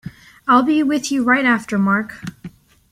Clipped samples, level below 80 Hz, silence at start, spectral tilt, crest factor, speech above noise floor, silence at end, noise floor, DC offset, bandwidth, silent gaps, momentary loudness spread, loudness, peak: under 0.1%; -54 dBFS; 0.05 s; -5 dB/octave; 16 dB; 23 dB; 0.45 s; -39 dBFS; under 0.1%; 14.5 kHz; none; 18 LU; -17 LUFS; -2 dBFS